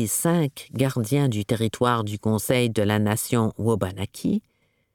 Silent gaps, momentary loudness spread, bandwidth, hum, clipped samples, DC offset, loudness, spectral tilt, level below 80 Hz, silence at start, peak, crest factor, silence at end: none; 5 LU; 19 kHz; none; under 0.1%; under 0.1%; -24 LUFS; -5.5 dB/octave; -56 dBFS; 0 s; -6 dBFS; 18 dB; 0.55 s